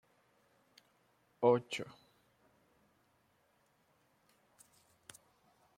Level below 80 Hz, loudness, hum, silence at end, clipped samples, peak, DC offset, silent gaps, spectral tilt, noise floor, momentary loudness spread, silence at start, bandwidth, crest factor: -86 dBFS; -34 LUFS; none; 3.9 s; under 0.1%; -16 dBFS; under 0.1%; none; -5.5 dB/octave; -74 dBFS; 26 LU; 1.4 s; 15.5 kHz; 28 dB